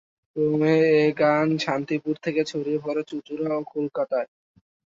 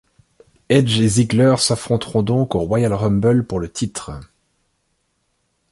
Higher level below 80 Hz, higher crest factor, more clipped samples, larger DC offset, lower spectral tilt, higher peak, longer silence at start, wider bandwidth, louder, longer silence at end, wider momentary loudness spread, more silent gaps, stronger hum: second, -70 dBFS vs -44 dBFS; about the same, 16 dB vs 16 dB; neither; neither; about the same, -6.5 dB/octave vs -5.5 dB/octave; second, -8 dBFS vs -2 dBFS; second, 0.35 s vs 0.7 s; second, 7.6 kHz vs 11.5 kHz; second, -24 LUFS vs -17 LUFS; second, 0.65 s vs 1.5 s; about the same, 10 LU vs 11 LU; neither; neither